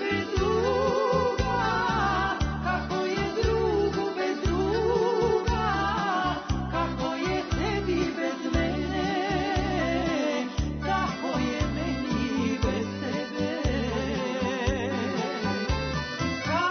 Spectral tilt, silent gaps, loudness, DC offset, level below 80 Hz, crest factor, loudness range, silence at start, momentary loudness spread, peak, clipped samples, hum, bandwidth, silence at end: -6 dB/octave; none; -27 LUFS; under 0.1%; -38 dBFS; 16 dB; 3 LU; 0 s; 4 LU; -12 dBFS; under 0.1%; none; 6.6 kHz; 0 s